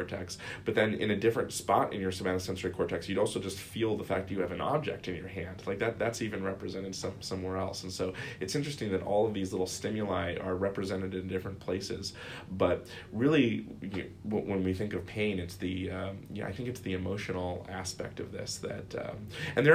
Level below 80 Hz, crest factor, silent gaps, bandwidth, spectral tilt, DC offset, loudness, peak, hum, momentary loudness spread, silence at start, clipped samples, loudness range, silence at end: -58 dBFS; 22 dB; none; 15.5 kHz; -5.5 dB/octave; under 0.1%; -34 LUFS; -10 dBFS; none; 10 LU; 0 s; under 0.1%; 4 LU; 0 s